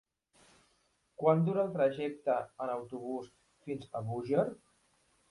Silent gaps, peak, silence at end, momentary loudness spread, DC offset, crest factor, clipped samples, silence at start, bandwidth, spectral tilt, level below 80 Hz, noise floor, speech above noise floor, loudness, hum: none; -14 dBFS; 0.75 s; 14 LU; under 0.1%; 22 dB; under 0.1%; 1.2 s; 11.5 kHz; -8.5 dB/octave; -74 dBFS; -74 dBFS; 41 dB; -34 LUFS; none